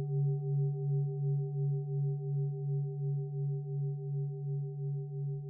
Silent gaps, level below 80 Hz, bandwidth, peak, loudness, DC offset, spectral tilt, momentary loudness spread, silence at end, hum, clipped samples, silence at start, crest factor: none; -84 dBFS; 0.8 kHz; -26 dBFS; -35 LUFS; under 0.1%; -12 dB/octave; 5 LU; 0 s; none; under 0.1%; 0 s; 8 dB